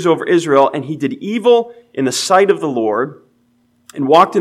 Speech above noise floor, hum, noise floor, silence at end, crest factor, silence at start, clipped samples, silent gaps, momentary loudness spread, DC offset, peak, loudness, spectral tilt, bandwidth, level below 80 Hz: 44 dB; none; -58 dBFS; 0 s; 14 dB; 0 s; 0.1%; none; 11 LU; under 0.1%; 0 dBFS; -14 LUFS; -4.5 dB/octave; 14.5 kHz; -66 dBFS